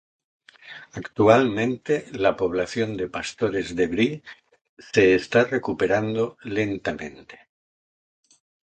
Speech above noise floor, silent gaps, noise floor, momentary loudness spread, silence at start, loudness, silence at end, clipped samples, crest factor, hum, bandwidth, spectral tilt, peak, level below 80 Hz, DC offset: 22 dB; 4.69-4.77 s; -45 dBFS; 17 LU; 0.65 s; -23 LUFS; 1.3 s; under 0.1%; 22 dB; none; 9.2 kHz; -6 dB/octave; -2 dBFS; -54 dBFS; under 0.1%